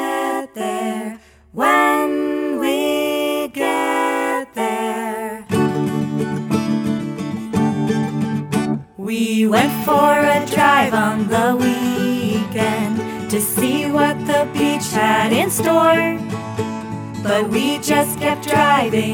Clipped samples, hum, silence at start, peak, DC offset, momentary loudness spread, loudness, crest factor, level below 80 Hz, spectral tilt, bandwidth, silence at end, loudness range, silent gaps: under 0.1%; none; 0 s; -2 dBFS; under 0.1%; 10 LU; -18 LUFS; 16 dB; -54 dBFS; -4.5 dB/octave; over 20 kHz; 0 s; 5 LU; none